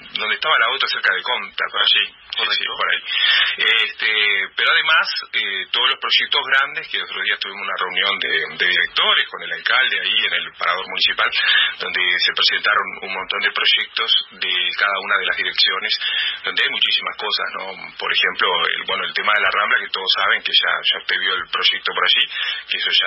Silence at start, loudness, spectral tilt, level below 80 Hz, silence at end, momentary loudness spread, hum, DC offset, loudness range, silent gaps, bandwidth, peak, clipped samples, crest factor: 0 s; -17 LUFS; -2 dB/octave; -64 dBFS; 0 s; 7 LU; none; under 0.1%; 2 LU; none; 8 kHz; -4 dBFS; under 0.1%; 16 dB